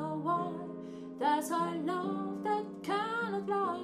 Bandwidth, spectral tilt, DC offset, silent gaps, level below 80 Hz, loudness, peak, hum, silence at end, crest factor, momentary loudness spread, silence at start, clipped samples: 15.5 kHz; -5.5 dB/octave; under 0.1%; none; -78 dBFS; -34 LUFS; -20 dBFS; none; 0 s; 14 dB; 9 LU; 0 s; under 0.1%